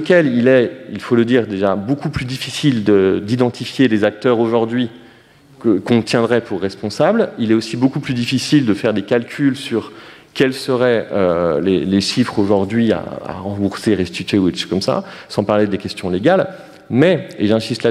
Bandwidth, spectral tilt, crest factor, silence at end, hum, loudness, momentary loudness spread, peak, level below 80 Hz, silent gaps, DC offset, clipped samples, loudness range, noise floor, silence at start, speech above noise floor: 14 kHz; -6 dB/octave; 16 dB; 0 s; none; -17 LUFS; 8 LU; 0 dBFS; -50 dBFS; none; under 0.1%; under 0.1%; 2 LU; -46 dBFS; 0 s; 30 dB